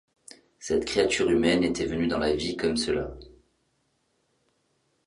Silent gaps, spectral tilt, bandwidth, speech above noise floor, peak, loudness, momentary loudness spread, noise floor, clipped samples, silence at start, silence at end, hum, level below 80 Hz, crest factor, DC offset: none; -4.5 dB/octave; 11.5 kHz; 47 dB; -8 dBFS; -26 LUFS; 7 LU; -72 dBFS; under 0.1%; 0.6 s; 1.8 s; none; -48 dBFS; 20 dB; under 0.1%